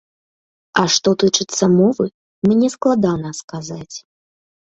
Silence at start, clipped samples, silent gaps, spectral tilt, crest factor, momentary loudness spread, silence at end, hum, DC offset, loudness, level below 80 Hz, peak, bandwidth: 0.75 s; under 0.1%; 2.14-2.42 s, 3.44-3.48 s; -4.5 dB/octave; 18 dB; 15 LU; 0.65 s; none; under 0.1%; -16 LUFS; -56 dBFS; 0 dBFS; 8.2 kHz